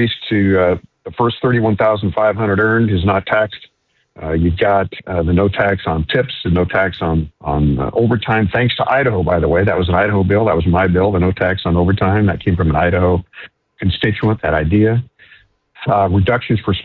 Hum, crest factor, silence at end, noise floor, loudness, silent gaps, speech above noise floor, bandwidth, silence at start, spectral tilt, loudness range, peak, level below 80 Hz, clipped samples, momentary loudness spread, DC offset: none; 12 dB; 0 s; -49 dBFS; -15 LUFS; none; 34 dB; 4.4 kHz; 0 s; -10 dB/octave; 3 LU; -2 dBFS; -28 dBFS; under 0.1%; 6 LU; under 0.1%